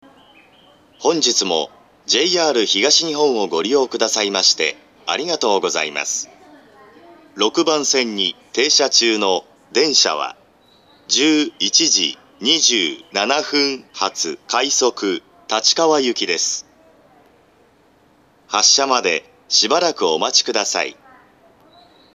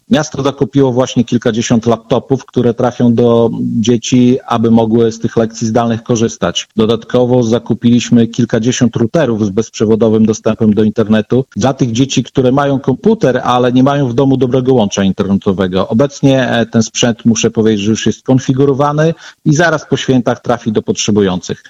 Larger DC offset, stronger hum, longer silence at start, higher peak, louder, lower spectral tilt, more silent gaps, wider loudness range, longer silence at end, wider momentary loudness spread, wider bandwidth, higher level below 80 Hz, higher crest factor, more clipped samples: neither; neither; first, 1 s vs 0.1 s; about the same, 0 dBFS vs 0 dBFS; second, -16 LUFS vs -12 LUFS; second, -0.5 dB/octave vs -6 dB/octave; neither; first, 4 LU vs 1 LU; first, 1.25 s vs 0.15 s; first, 10 LU vs 5 LU; first, 13.5 kHz vs 8 kHz; second, -72 dBFS vs -44 dBFS; first, 20 dB vs 12 dB; neither